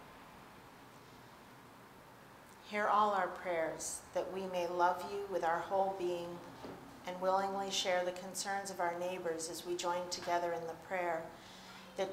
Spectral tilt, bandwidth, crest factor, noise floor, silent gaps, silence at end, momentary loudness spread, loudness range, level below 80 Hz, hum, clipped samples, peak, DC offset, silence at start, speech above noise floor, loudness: -3 dB/octave; 16 kHz; 20 dB; -57 dBFS; none; 0 s; 23 LU; 3 LU; -72 dBFS; none; under 0.1%; -18 dBFS; under 0.1%; 0 s; 20 dB; -37 LUFS